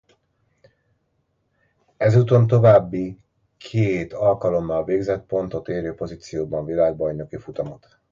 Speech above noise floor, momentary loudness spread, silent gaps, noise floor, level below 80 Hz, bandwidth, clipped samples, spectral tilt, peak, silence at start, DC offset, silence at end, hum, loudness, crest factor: 50 dB; 16 LU; none; -70 dBFS; -50 dBFS; 7.4 kHz; under 0.1%; -8.5 dB/octave; -2 dBFS; 2 s; under 0.1%; 0.35 s; none; -21 LUFS; 20 dB